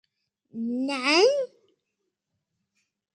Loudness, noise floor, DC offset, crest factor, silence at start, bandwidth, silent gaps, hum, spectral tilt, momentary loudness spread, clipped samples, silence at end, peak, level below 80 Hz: -24 LUFS; -81 dBFS; under 0.1%; 20 dB; 0.55 s; 10.5 kHz; none; none; -2 dB/octave; 17 LU; under 0.1%; 1.7 s; -8 dBFS; -86 dBFS